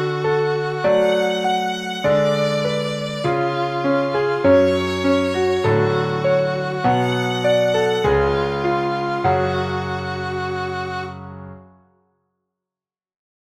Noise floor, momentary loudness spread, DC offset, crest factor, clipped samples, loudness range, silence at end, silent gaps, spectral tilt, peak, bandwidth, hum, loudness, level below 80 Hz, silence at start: under -90 dBFS; 8 LU; under 0.1%; 16 dB; under 0.1%; 8 LU; 1.8 s; none; -6 dB/octave; -4 dBFS; 13.5 kHz; none; -19 LUFS; -44 dBFS; 0 s